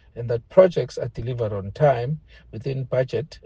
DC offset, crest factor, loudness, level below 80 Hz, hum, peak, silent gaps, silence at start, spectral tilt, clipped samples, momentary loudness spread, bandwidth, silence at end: under 0.1%; 22 dB; -23 LUFS; -48 dBFS; none; -2 dBFS; none; 0.15 s; -8 dB/octave; under 0.1%; 13 LU; 7.8 kHz; 0.05 s